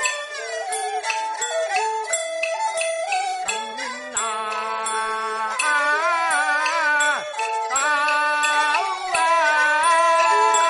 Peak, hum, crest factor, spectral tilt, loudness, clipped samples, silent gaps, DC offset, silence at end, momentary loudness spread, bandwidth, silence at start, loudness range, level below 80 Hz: -6 dBFS; none; 16 dB; 1.5 dB/octave; -21 LUFS; under 0.1%; none; under 0.1%; 0 s; 9 LU; 11.5 kHz; 0 s; 5 LU; -68 dBFS